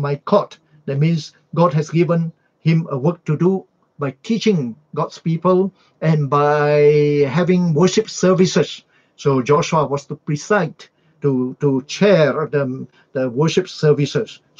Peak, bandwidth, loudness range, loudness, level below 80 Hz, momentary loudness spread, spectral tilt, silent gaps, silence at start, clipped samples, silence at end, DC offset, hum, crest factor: -2 dBFS; 7.6 kHz; 4 LU; -18 LUFS; -60 dBFS; 11 LU; -6.5 dB/octave; none; 0 s; under 0.1%; 0.25 s; under 0.1%; none; 16 dB